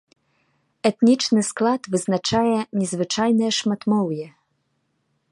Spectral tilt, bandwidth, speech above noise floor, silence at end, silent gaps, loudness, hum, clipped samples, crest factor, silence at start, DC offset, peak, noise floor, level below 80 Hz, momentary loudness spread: -4.5 dB/octave; 11.5 kHz; 50 dB; 1 s; none; -21 LUFS; none; under 0.1%; 18 dB; 0.85 s; under 0.1%; -4 dBFS; -71 dBFS; -60 dBFS; 6 LU